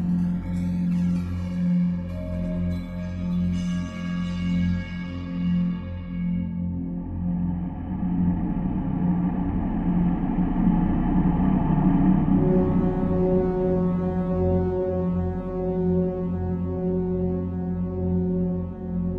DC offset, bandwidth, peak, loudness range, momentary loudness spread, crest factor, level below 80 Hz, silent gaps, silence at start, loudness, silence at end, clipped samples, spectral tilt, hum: under 0.1%; 6.2 kHz; -8 dBFS; 6 LU; 8 LU; 16 dB; -36 dBFS; none; 0 s; -25 LUFS; 0 s; under 0.1%; -10 dB/octave; none